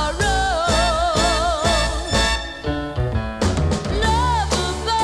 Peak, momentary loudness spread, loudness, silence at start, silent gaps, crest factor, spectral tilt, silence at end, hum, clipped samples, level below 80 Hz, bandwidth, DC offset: -6 dBFS; 6 LU; -20 LUFS; 0 s; none; 14 dB; -4 dB/octave; 0 s; none; under 0.1%; -26 dBFS; 13.5 kHz; under 0.1%